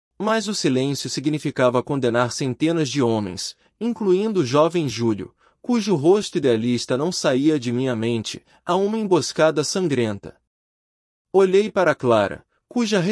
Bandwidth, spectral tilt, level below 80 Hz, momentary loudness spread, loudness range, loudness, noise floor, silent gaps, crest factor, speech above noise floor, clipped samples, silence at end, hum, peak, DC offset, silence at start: 12 kHz; -5 dB/octave; -64 dBFS; 10 LU; 2 LU; -21 LUFS; under -90 dBFS; 10.47-11.25 s; 16 dB; over 70 dB; under 0.1%; 0 s; none; -4 dBFS; under 0.1%; 0.2 s